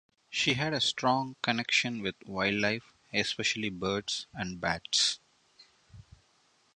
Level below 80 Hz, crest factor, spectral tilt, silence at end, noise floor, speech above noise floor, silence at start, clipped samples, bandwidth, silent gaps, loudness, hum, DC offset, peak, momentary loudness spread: -62 dBFS; 24 dB; -3 dB/octave; 0.75 s; -68 dBFS; 37 dB; 0.3 s; under 0.1%; 10.5 kHz; none; -30 LUFS; none; under 0.1%; -10 dBFS; 9 LU